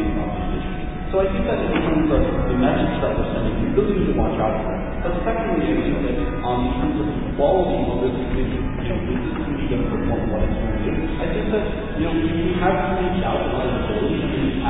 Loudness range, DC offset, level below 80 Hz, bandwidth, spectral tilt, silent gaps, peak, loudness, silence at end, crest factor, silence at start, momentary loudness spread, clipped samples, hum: 3 LU; under 0.1%; -28 dBFS; 4 kHz; -11.5 dB/octave; none; -6 dBFS; -22 LUFS; 0 s; 14 dB; 0 s; 6 LU; under 0.1%; none